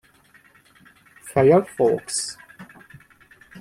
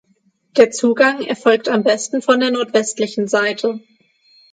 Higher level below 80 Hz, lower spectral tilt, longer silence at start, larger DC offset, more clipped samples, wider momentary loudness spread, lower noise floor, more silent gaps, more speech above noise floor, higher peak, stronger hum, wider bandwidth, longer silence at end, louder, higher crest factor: first, -60 dBFS vs -68 dBFS; first, -5 dB/octave vs -3.5 dB/octave; first, 1.25 s vs 0.55 s; neither; neither; first, 27 LU vs 7 LU; second, -55 dBFS vs -61 dBFS; neither; second, 36 dB vs 45 dB; second, -4 dBFS vs 0 dBFS; neither; first, 15.5 kHz vs 9.4 kHz; second, 0 s vs 0.75 s; second, -20 LUFS vs -16 LUFS; about the same, 20 dB vs 16 dB